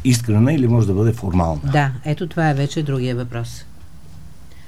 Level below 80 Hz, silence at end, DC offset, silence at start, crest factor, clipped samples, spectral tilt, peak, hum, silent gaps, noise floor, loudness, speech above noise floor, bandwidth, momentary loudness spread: -40 dBFS; 0.1 s; 2%; 0 s; 16 dB; under 0.1%; -6.5 dB/octave; -4 dBFS; none; none; -41 dBFS; -19 LUFS; 24 dB; 14 kHz; 11 LU